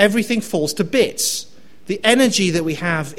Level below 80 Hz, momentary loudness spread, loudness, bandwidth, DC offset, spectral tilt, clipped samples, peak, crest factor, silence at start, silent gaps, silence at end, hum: -52 dBFS; 7 LU; -18 LUFS; 16.5 kHz; 1%; -3.5 dB/octave; under 0.1%; 0 dBFS; 18 dB; 0 s; none; 0.05 s; none